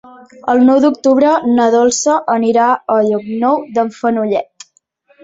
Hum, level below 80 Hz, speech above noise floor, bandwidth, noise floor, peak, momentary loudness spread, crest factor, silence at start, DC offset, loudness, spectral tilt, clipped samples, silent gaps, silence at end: none; -58 dBFS; 43 dB; 8 kHz; -55 dBFS; 0 dBFS; 7 LU; 12 dB; 0.45 s; under 0.1%; -13 LUFS; -4.5 dB/octave; under 0.1%; none; 0.8 s